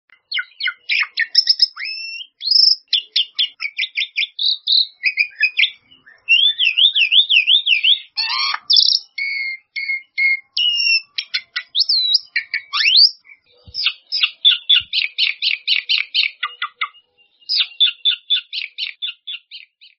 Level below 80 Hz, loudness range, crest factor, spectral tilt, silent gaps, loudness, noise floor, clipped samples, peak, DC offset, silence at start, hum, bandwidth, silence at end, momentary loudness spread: -68 dBFS; 5 LU; 18 dB; 8.5 dB/octave; none; -15 LUFS; -55 dBFS; under 0.1%; 0 dBFS; under 0.1%; 0.3 s; none; 6.2 kHz; 0.4 s; 14 LU